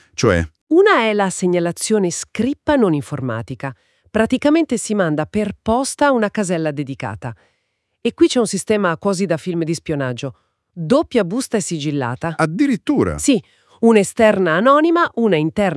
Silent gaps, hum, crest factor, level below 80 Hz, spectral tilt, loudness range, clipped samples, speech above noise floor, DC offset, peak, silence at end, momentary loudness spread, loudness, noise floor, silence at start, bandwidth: 0.61-0.67 s; none; 18 dB; -48 dBFS; -5 dB/octave; 4 LU; under 0.1%; 53 dB; under 0.1%; 0 dBFS; 0 s; 11 LU; -17 LUFS; -70 dBFS; 0.2 s; 12 kHz